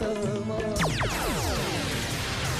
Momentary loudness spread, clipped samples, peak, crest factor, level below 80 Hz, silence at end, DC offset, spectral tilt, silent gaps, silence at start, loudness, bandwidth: 3 LU; under 0.1%; -16 dBFS; 12 dB; -40 dBFS; 0 s; under 0.1%; -4 dB/octave; none; 0 s; -28 LUFS; 15.5 kHz